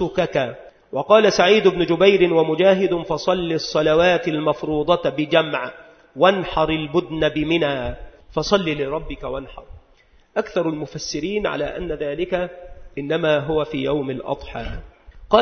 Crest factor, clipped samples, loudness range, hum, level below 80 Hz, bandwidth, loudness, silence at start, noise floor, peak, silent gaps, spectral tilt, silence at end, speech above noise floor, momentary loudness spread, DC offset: 20 dB; under 0.1%; 9 LU; none; -42 dBFS; 6.6 kHz; -20 LUFS; 0 s; -54 dBFS; 0 dBFS; none; -5.5 dB/octave; 0 s; 35 dB; 15 LU; under 0.1%